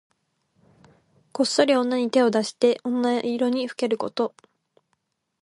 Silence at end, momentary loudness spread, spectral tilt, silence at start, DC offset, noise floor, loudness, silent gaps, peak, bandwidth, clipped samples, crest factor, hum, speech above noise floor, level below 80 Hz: 1.15 s; 7 LU; -4 dB/octave; 1.35 s; under 0.1%; -74 dBFS; -23 LUFS; none; -6 dBFS; 11.5 kHz; under 0.1%; 20 dB; none; 52 dB; -74 dBFS